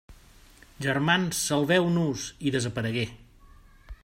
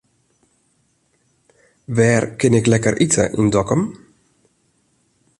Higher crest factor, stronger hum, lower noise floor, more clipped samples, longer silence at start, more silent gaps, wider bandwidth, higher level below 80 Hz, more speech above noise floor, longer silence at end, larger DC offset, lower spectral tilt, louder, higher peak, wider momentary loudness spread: about the same, 20 dB vs 18 dB; neither; second, -53 dBFS vs -63 dBFS; neither; second, 0.1 s vs 1.9 s; neither; first, 16 kHz vs 11.5 kHz; about the same, -52 dBFS vs -48 dBFS; second, 27 dB vs 47 dB; second, 0.1 s vs 1.45 s; neither; about the same, -4.5 dB/octave vs -5.5 dB/octave; second, -26 LUFS vs -17 LUFS; second, -8 dBFS vs -2 dBFS; about the same, 8 LU vs 6 LU